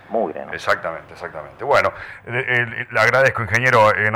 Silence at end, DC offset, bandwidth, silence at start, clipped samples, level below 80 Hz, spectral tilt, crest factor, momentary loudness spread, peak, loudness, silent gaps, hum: 0 s; under 0.1%; 16.5 kHz; 0.1 s; under 0.1%; -52 dBFS; -5 dB/octave; 14 dB; 18 LU; -6 dBFS; -18 LUFS; none; none